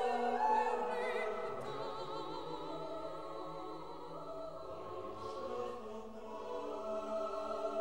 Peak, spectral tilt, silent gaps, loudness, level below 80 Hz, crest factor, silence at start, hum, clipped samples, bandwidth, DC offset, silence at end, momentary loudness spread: -22 dBFS; -5 dB/octave; none; -41 LUFS; -68 dBFS; 18 dB; 0 s; none; under 0.1%; 16 kHz; 0.3%; 0 s; 13 LU